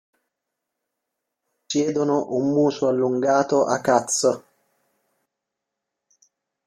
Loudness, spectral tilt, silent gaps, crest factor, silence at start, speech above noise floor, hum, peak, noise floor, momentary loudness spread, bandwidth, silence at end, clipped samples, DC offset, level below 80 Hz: -21 LUFS; -4.5 dB/octave; none; 20 dB; 1.7 s; 63 dB; none; -4 dBFS; -83 dBFS; 4 LU; 14.5 kHz; 2.25 s; under 0.1%; under 0.1%; -68 dBFS